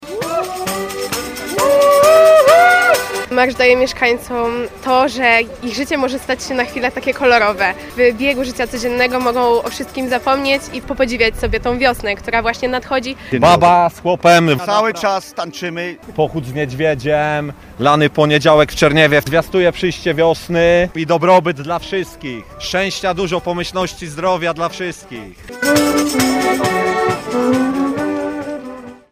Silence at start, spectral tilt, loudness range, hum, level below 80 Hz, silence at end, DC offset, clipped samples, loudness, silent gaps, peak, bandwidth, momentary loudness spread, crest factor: 0 s; -4.5 dB/octave; 6 LU; none; -38 dBFS; 0.15 s; under 0.1%; under 0.1%; -15 LUFS; none; 0 dBFS; 15.5 kHz; 12 LU; 14 dB